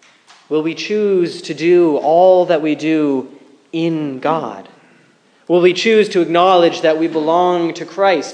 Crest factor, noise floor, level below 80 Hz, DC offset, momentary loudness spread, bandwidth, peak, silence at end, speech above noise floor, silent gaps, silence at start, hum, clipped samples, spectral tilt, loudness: 14 dB; -52 dBFS; -72 dBFS; under 0.1%; 10 LU; 9.4 kHz; 0 dBFS; 0 s; 38 dB; none; 0.5 s; none; under 0.1%; -5.5 dB/octave; -14 LUFS